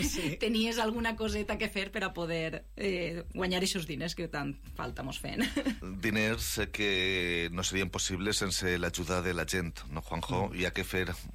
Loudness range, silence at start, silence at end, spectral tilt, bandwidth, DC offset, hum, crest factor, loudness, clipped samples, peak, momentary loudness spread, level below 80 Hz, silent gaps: 4 LU; 0 s; 0 s; -3.5 dB/octave; 16 kHz; under 0.1%; none; 14 dB; -32 LUFS; under 0.1%; -20 dBFS; 8 LU; -46 dBFS; none